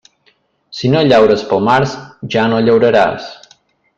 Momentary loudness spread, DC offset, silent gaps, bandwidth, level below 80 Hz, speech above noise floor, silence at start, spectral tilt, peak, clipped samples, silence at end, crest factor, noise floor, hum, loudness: 17 LU; under 0.1%; none; 8 kHz; -48 dBFS; 45 dB; 0.7 s; -6.5 dB/octave; 0 dBFS; under 0.1%; 0.65 s; 14 dB; -57 dBFS; none; -12 LUFS